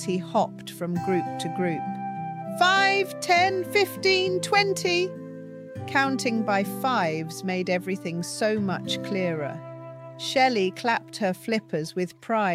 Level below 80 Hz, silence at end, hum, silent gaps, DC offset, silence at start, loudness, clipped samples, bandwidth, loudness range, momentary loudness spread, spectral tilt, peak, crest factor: -72 dBFS; 0 s; none; none; under 0.1%; 0 s; -25 LUFS; under 0.1%; 16 kHz; 5 LU; 12 LU; -4.5 dB/octave; -6 dBFS; 18 dB